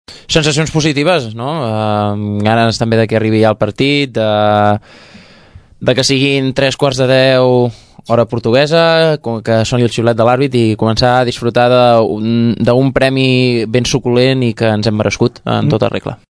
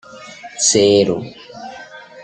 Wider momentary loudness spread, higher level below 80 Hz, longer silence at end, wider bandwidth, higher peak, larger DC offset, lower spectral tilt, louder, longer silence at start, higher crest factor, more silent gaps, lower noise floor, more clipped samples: second, 6 LU vs 24 LU; first, -40 dBFS vs -58 dBFS; first, 0.15 s vs 0 s; first, 11 kHz vs 9.4 kHz; about the same, 0 dBFS vs -2 dBFS; neither; first, -5.5 dB/octave vs -3 dB/octave; about the same, -12 LUFS vs -14 LUFS; about the same, 0.1 s vs 0.15 s; about the same, 12 dB vs 16 dB; neither; about the same, -40 dBFS vs -37 dBFS; first, 0.2% vs under 0.1%